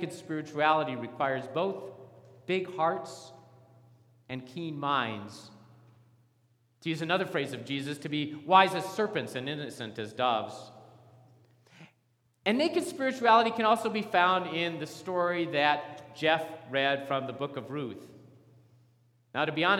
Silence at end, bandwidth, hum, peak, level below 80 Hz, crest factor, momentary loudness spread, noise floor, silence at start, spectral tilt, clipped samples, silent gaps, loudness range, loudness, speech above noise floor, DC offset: 0 s; 16.5 kHz; none; -6 dBFS; -82 dBFS; 24 dB; 17 LU; -71 dBFS; 0 s; -5 dB/octave; under 0.1%; none; 9 LU; -30 LUFS; 42 dB; under 0.1%